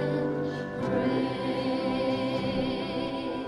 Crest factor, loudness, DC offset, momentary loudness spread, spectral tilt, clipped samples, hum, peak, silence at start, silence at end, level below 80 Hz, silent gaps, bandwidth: 14 dB; -29 LUFS; under 0.1%; 4 LU; -7 dB/octave; under 0.1%; none; -16 dBFS; 0 s; 0 s; -56 dBFS; none; 11 kHz